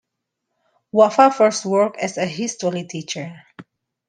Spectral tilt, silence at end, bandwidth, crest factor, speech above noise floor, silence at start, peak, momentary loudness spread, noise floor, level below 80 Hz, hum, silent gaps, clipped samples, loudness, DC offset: -4.5 dB/octave; 0.45 s; 10 kHz; 18 dB; 60 dB; 0.95 s; -2 dBFS; 15 LU; -79 dBFS; -68 dBFS; none; none; under 0.1%; -19 LUFS; under 0.1%